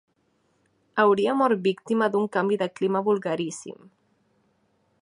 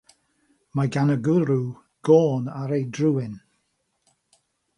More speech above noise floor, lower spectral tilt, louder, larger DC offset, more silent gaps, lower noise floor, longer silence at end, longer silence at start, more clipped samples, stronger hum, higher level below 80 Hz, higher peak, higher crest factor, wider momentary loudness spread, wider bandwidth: second, 45 dB vs 51 dB; second, -5.5 dB/octave vs -8.5 dB/octave; about the same, -24 LUFS vs -23 LUFS; neither; neither; second, -69 dBFS vs -73 dBFS; about the same, 1.3 s vs 1.4 s; first, 0.95 s vs 0.75 s; neither; neither; second, -74 dBFS vs -66 dBFS; about the same, -6 dBFS vs -4 dBFS; about the same, 20 dB vs 20 dB; second, 11 LU vs 14 LU; about the same, 11 kHz vs 11 kHz